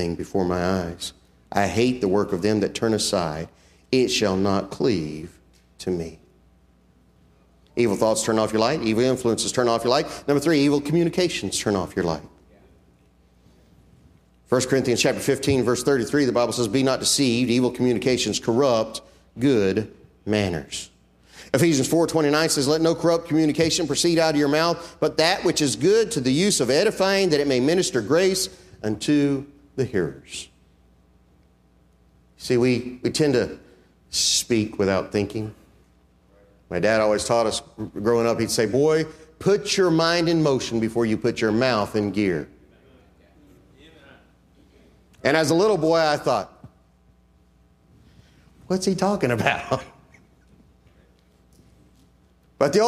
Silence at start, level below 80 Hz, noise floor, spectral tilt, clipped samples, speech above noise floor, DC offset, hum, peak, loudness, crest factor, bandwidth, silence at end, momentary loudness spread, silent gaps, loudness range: 0 s; -54 dBFS; -58 dBFS; -4.5 dB/octave; under 0.1%; 37 dB; under 0.1%; none; -2 dBFS; -22 LUFS; 20 dB; 15.5 kHz; 0 s; 11 LU; none; 8 LU